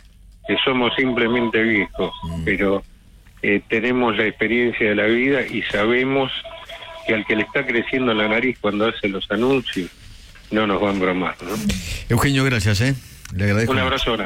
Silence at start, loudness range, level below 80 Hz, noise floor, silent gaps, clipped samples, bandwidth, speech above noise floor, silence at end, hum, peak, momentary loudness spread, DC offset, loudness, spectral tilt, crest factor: 0.3 s; 2 LU; -40 dBFS; -46 dBFS; none; under 0.1%; 16.5 kHz; 27 dB; 0 s; none; -8 dBFS; 8 LU; under 0.1%; -20 LUFS; -5.5 dB/octave; 12 dB